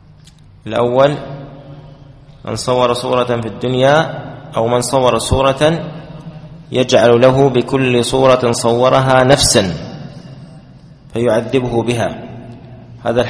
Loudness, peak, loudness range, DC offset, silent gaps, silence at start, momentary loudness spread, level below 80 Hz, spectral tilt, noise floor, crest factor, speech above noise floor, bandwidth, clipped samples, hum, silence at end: -13 LUFS; 0 dBFS; 6 LU; under 0.1%; none; 0.65 s; 22 LU; -38 dBFS; -5 dB/octave; -42 dBFS; 14 dB; 29 dB; 11 kHz; under 0.1%; none; 0 s